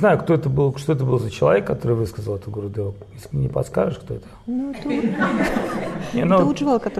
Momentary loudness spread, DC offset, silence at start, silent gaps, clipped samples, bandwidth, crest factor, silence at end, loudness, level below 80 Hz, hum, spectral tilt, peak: 12 LU; under 0.1%; 0 s; none; under 0.1%; 13.5 kHz; 16 dB; 0 s; -21 LUFS; -44 dBFS; none; -7.5 dB/octave; -4 dBFS